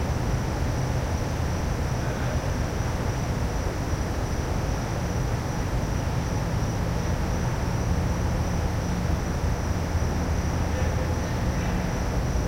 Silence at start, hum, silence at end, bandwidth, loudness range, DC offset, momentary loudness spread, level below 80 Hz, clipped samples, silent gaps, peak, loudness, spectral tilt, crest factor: 0 s; none; 0 s; 16 kHz; 1 LU; under 0.1%; 2 LU; -30 dBFS; under 0.1%; none; -12 dBFS; -27 LUFS; -6 dB/octave; 14 dB